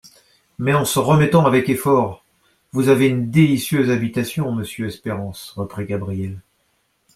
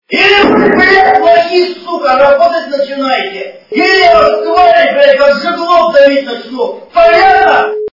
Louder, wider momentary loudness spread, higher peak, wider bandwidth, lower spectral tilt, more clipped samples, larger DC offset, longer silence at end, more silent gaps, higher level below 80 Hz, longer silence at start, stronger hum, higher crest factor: second, -19 LUFS vs -7 LUFS; first, 13 LU vs 10 LU; about the same, -2 dBFS vs 0 dBFS; first, 16 kHz vs 6 kHz; first, -6 dB/octave vs -4.5 dB/octave; second, under 0.1% vs 2%; neither; first, 0.75 s vs 0.05 s; neither; second, -52 dBFS vs -42 dBFS; first, 0.6 s vs 0.1 s; neither; first, 16 dB vs 8 dB